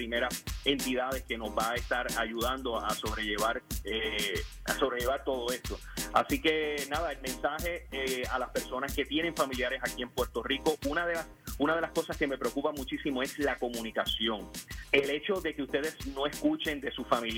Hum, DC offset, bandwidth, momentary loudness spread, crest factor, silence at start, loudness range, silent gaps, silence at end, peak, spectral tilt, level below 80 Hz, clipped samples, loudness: none; under 0.1%; 18 kHz; 6 LU; 24 dB; 0 s; 1 LU; none; 0 s; -10 dBFS; -3.5 dB/octave; -46 dBFS; under 0.1%; -32 LUFS